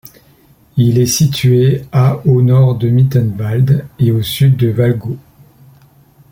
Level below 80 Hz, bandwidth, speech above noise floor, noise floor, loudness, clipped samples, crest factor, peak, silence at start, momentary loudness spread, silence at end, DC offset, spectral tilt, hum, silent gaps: -44 dBFS; 17 kHz; 36 dB; -47 dBFS; -12 LUFS; under 0.1%; 12 dB; 0 dBFS; 0.75 s; 5 LU; 1.1 s; under 0.1%; -6.5 dB/octave; none; none